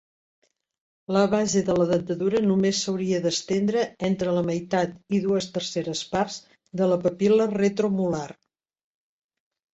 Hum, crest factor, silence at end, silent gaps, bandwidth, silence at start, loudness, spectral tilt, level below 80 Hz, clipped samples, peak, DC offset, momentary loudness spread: none; 18 dB; 1.4 s; none; 8 kHz; 1.1 s; -24 LUFS; -5.5 dB/octave; -60 dBFS; under 0.1%; -8 dBFS; under 0.1%; 7 LU